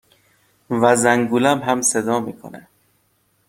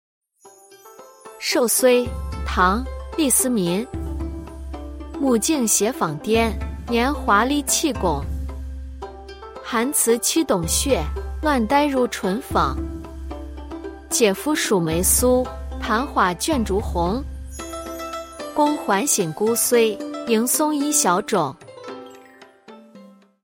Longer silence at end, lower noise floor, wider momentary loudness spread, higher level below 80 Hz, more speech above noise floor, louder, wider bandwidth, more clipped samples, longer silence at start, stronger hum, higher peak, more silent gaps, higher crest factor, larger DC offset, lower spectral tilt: first, 0.9 s vs 0.35 s; first, -64 dBFS vs -50 dBFS; about the same, 16 LU vs 17 LU; second, -60 dBFS vs -34 dBFS; first, 46 dB vs 30 dB; first, -17 LUFS vs -20 LUFS; about the same, 16.5 kHz vs 16.5 kHz; neither; first, 0.7 s vs 0.45 s; neither; about the same, -2 dBFS vs -4 dBFS; neither; about the same, 18 dB vs 18 dB; neither; about the same, -4 dB/octave vs -3.5 dB/octave